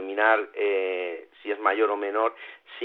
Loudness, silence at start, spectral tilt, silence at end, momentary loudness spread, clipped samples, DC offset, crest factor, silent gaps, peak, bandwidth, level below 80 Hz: -25 LUFS; 0 s; -4 dB/octave; 0 s; 14 LU; under 0.1%; under 0.1%; 20 dB; none; -8 dBFS; 4.3 kHz; under -90 dBFS